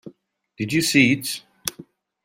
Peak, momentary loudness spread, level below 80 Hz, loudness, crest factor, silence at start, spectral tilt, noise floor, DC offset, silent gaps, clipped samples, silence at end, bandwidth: -2 dBFS; 14 LU; -60 dBFS; -21 LUFS; 22 dB; 0.05 s; -3.5 dB/octave; -58 dBFS; under 0.1%; none; under 0.1%; 0.45 s; 16 kHz